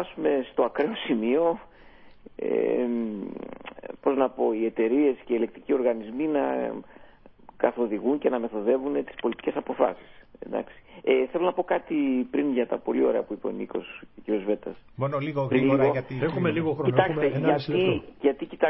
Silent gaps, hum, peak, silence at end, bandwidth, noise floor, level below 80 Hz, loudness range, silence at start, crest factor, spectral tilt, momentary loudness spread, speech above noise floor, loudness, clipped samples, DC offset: none; none; -6 dBFS; 0 s; 5.8 kHz; -51 dBFS; -60 dBFS; 4 LU; 0 s; 20 dB; -11 dB/octave; 11 LU; 25 dB; -26 LUFS; under 0.1%; under 0.1%